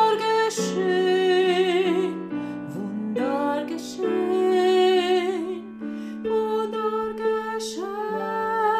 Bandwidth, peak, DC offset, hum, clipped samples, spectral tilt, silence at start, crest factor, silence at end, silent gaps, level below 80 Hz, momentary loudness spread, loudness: 14.5 kHz; -8 dBFS; under 0.1%; none; under 0.1%; -4.5 dB/octave; 0 s; 14 dB; 0 s; none; -66 dBFS; 12 LU; -24 LUFS